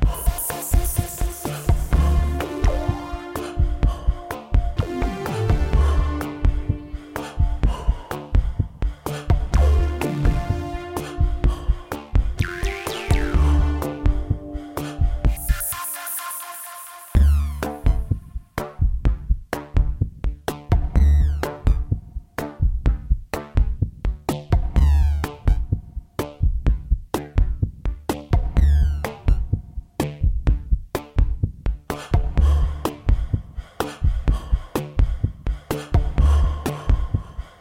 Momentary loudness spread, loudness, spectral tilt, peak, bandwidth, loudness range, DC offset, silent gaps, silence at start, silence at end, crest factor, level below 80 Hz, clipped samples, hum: 10 LU; -24 LUFS; -6 dB/octave; -6 dBFS; 16.5 kHz; 2 LU; under 0.1%; none; 0 s; 0.1 s; 14 dB; -22 dBFS; under 0.1%; none